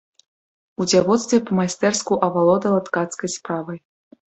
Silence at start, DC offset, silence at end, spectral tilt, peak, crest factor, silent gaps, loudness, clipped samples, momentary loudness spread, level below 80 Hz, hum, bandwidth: 0.8 s; under 0.1%; 0.55 s; -4.5 dB/octave; -2 dBFS; 18 dB; none; -20 LUFS; under 0.1%; 11 LU; -60 dBFS; none; 8.4 kHz